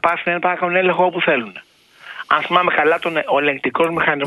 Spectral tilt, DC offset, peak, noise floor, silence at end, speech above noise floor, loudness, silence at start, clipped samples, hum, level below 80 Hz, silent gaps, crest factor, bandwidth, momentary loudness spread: -6 dB/octave; under 0.1%; 0 dBFS; -40 dBFS; 0 s; 23 dB; -17 LUFS; 0.05 s; under 0.1%; none; -60 dBFS; none; 18 dB; 12 kHz; 5 LU